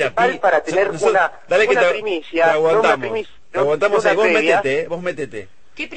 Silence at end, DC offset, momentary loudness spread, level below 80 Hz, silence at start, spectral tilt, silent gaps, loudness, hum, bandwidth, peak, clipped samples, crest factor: 0 s; 1%; 12 LU; -56 dBFS; 0 s; -4 dB/octave; none; -17 LUFS; none; 8.8 kHz; -2 dBFS; under 0.1%; 14 dB